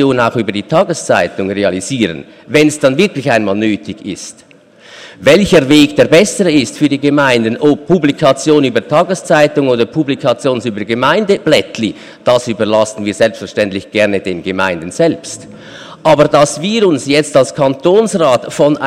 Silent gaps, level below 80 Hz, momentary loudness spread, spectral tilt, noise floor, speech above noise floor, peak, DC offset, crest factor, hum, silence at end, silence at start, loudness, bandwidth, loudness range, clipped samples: none; -46 dBFS; 9 LU; -5 dB/octave; -40 dBFS; 28 dB; 0 dBFS; under 0.1%; 12 dB; none; 0 s; 0 s; -12 LUFS; 15.5 kHz; 4 LU; under 0.1%